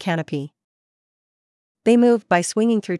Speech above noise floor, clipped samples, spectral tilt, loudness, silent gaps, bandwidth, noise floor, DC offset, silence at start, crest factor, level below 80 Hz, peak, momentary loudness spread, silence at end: over 72 dB; under 0.1%; -5.5 dB/octave; -19 LUFS; 0.64-1.75 s; 12 kHz; under -90 dBFS; under 0.1%; 0 s; 16 dB; -72 dBFS; -4 dBFS; 14 LU; 0 s